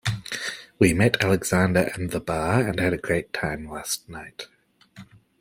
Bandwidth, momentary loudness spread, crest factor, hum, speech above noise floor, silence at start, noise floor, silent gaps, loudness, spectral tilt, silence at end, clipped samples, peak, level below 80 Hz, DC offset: 16.5 kHz; 15 LU; 22 dB; none; 25 dB; 0.05 s; -49 dBFS; none; -24 LUFS; -5 dB/octave; 0.35 s; under 0.1%; -4 dBFS; -50 dBFS; under 0.1%